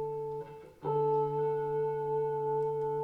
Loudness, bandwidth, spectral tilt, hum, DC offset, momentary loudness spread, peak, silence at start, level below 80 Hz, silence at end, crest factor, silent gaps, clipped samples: -33 LUFS; 4.2 kHz; -9 dB/octave; none; under 0.1%; 10 LU; -20 dBFS; 0 s; -66 dBFS; 0 s; 12 dB; none; under 0.1%